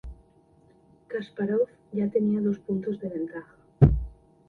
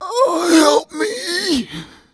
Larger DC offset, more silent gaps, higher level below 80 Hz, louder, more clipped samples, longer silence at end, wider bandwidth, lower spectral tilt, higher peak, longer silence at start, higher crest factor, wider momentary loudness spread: neither; neither; first, -38 dBFS vs -52 dBFS; second, -27 LUFS vs -16 LUFS; neither; about the same, 0.35 s vs 0.3 s; second, 4.3 kHz vs 11 kHz; first, -11 dB/octave vs -2.5 dB/octave; about the same, -2 dBFS vs 0 dBFS; about the same, 0.05 s vs 0 s; first, 24 dB vs 16 dB; about the same, 15 LU vs 13 LU